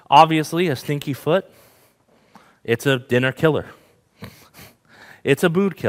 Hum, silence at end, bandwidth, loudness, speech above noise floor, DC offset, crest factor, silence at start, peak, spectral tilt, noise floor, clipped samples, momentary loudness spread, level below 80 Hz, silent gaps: none; 0 s; 16 kHz; -19 LUFS; 39 dB; under 0.1%; 20 dB; 0.1 s; 0 dBFS; -5.5 dB/octave; -58 dBFS; under 0.1%; 17 LU; -60 dBFS; none